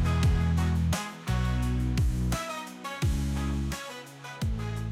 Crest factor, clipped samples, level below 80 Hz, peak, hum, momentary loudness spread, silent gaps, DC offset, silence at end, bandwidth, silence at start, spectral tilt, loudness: 12 dB; under 0.1%; -34 dBFS; -16 dBFS; none; 11 LU; none; under 0.1%; 0 s; 16 kHz; 0 s; -6 dB/octave; -30 LUFS